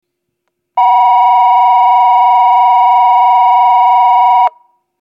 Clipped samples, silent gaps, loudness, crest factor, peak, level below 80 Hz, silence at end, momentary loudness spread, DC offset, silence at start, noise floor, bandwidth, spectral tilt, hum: under 0.1%; none; -8 LUFS; 8 dB; 0 dBFS; -88 dBFS; 0.5 s; 3 LU; under 0.1%; 0.75 s; -70 dBFS; 5.2 kHz; 0.5 dB/octave; none